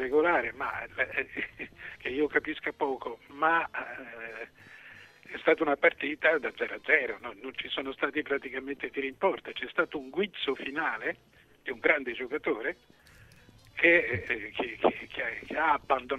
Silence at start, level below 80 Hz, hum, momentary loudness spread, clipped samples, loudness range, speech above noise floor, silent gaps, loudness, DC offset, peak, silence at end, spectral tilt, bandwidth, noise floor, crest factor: 0 s; -64 dBFS; none; 16 LU; under 0.1%; 4 LU; 26 dB; none; -30 LUFS; under 0.1%; -8 dBFS; 0 s; -5.5 dB/octave; 12.5 kHz; -56 dBFS; 22 dB